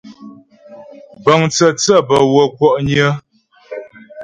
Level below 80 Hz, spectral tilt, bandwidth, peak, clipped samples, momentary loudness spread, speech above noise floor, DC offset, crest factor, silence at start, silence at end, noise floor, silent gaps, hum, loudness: -50 dBFS; -4.5 dB/octave; 11 kHz; 0 dBFS; under 0.1%; 20 LU; 27 dB; under 0.1%; 16 dB; 0.05 s; 0 s; -39 dBFS; none; none; -13 LUFS